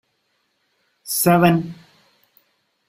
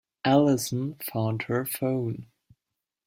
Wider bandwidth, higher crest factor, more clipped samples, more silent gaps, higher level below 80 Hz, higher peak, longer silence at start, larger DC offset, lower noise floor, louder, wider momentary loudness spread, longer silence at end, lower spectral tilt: about the same, 16 kHz vs 16.5 kHz; about the same, 20 dB vs 20 dB; neither; neither; first, -58 dBFS vs -64 dBFS; first, -2 dBFS vs -8 dBFS; first, 1.05 s vs 0.25 s; neither; second, -69 dBFS vs -86 dBFS; first, -17 LUFS vs -27 LUFS; first, 20 LU vs 10 LU; first, 1.15 s vs 0.8 s; about the same, -5 dB/octave vs -6 dB/octave